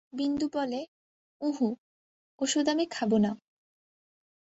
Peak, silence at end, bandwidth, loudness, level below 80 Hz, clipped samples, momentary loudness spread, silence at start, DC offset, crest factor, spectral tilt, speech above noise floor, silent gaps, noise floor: -14 dBFS; 1.25 s; 8.2 kHz; -30 LUFS; -68 dBFS; under 0.1%; 12 LU; 0.15 s; under 0.1%; 18 dB; -4.5 dB/octave; over 61 dB; 0.88-1.40 s, 1.78-2.38 s; under -90 dBFS